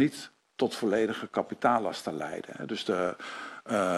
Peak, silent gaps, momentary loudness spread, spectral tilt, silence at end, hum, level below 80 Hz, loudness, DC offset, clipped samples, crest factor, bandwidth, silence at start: -12 dBFS; none; 12 LU; -5 dB/octave; 0 s; none; -70 dBFS; -31 LUFS; under 0.1%; under 0.1%; 18 dB; 13.5 kHz; 0 s